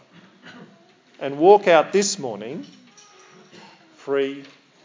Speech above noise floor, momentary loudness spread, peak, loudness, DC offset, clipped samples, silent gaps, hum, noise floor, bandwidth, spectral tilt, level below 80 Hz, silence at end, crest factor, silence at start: 35 dB; 21 LU; 0 dBFS; -19 LUFS; under 0.1%; under 0.1%; none; none; -54 dBFS; 7.6 kHz; -3.5 dB/octave; -88 dBFS; 0.4 s; 22 dB; 0.45 s